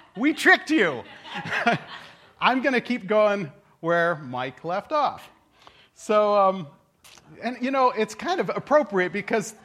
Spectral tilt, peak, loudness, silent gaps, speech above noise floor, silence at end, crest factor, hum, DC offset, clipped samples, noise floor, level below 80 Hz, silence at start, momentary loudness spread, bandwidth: -4.5 dB/octave; -4 dBFS; -23 LUFS; none; 31 dB; 0.1 s; 20 dB; none; under 0.1%; under 0.1%; -54 dBFS; -70 dBFS; 0.15 s; 16 LU; 15 kHz